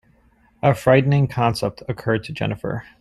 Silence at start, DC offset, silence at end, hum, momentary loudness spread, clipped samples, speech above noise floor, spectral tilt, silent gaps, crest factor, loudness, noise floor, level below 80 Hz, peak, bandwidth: 0.65 s; under 0.1%; 0.2 s; none; 12 LU; under 0.1%; 38 dB; -7 dB/octave; none; 18 dB; -20 LUFS; -57 dBFS; -50 dBFS; -2 dBFS; 13 kHz